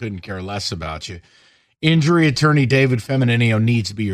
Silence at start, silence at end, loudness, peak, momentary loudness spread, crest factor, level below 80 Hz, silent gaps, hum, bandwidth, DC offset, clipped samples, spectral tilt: 0 s; 0 s; -17 LUFS; -2 dBFS; 14 LU; 16 dB; -48 dBFS; none; none; 13 kHz; under 0.1%; under 0.1%; -6 dB/octave